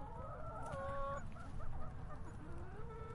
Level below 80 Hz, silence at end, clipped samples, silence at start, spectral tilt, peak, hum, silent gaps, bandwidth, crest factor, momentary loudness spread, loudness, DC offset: -50 dBFS; 0 s; under 0.1%; 0 s; -7 dB/octave; -30 dBFS; none; none; 11 kHz; 14 dB; 8 LU; -49 LUFS; under 0.1%